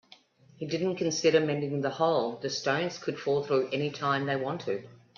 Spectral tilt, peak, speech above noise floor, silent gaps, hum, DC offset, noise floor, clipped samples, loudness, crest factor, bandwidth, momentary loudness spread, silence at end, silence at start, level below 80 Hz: -5 dB/octave; -12 dBFS; 29 dB; none; none; under 0.1%; -58 dBFS; under 0.1%; -29 LUFS; 18 dB; 7.4 kHz; 9 LU; 0.25 s; 0.6 s; -74 dBFS